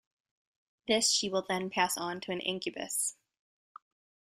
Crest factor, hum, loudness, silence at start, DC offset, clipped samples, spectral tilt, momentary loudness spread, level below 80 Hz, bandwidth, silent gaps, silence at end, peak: 22 dB; none; -31 LUFS; 0.85 s; under 0.1%; under 0.1%; -2 dB/octave; 9 LU; -74 dBFS; 15.5 kHz; none; 1.25 s; -14 dBFS